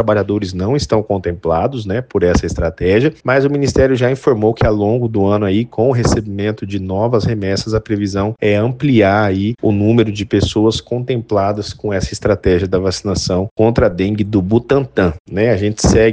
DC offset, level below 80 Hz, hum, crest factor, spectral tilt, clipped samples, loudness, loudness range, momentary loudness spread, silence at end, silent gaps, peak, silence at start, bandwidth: under 0.1%; -32 dBFS; none; 14 dB; -6.5 dB/octave; under 0.1%; -15 LUFS; 2 LU; 6 LU; 0 s; 13.51-13.56 s, 15.20-15.25 s; 0 dBFS; 0 s; 9.6 kHz